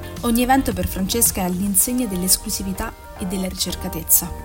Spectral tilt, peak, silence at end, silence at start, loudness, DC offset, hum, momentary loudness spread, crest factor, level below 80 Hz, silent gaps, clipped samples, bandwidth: -3.5 dB/octave; 0 dBFS; 0 s; 0 s; -19 LUFS; under 0.1%; none; 11 LU; 20 dB; -34 dBFS; none; under 0.1%; 17 kHz